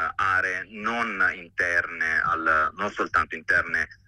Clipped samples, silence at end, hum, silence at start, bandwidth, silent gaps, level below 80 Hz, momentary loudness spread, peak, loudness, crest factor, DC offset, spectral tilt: under 0.1%; 0.15 s; none; 0 s; 11 kHz; none; -54 dBFS; 5 LU; -10 dBFS; -24 LUFS; 16 dB; under 0.1%; -4 dB/octave